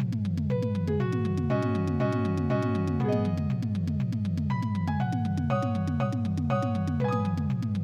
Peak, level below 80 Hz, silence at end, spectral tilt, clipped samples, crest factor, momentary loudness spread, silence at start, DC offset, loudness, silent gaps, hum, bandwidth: -14 dBFS; -50 dBFS; 0 s; -8.5 dB/octave; under 0.1%; 14 dB; 2 LU; 0 s; under 0.1%; -28 LUFS; none; none; 9.4 kHz